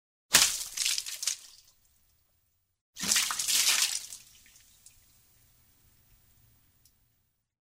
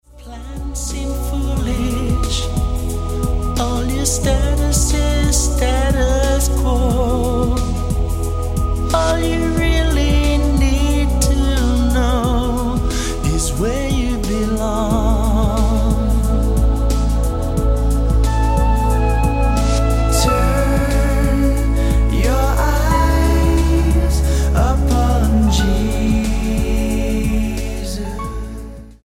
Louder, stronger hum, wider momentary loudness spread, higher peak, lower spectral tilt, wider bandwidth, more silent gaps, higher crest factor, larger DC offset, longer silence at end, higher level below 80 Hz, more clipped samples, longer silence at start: second, -26 LUFS vs -17 LUFS; neither; first, 14 LU vs 6 LU; about the same, -2 dBFS vs -2 dBFS; second, 2 dB/octave vs -5.5 dB/octave; about the same, 16 kHz vs 16 kHz; first, 2.81-2.93 s vs none; first, 32 dB vs 14 dB; neither; first, 3.6 s vs 0.1 s; second, -66 dBFS vs -18 dBFS; neither; first, 0.3 s vs 0.15 s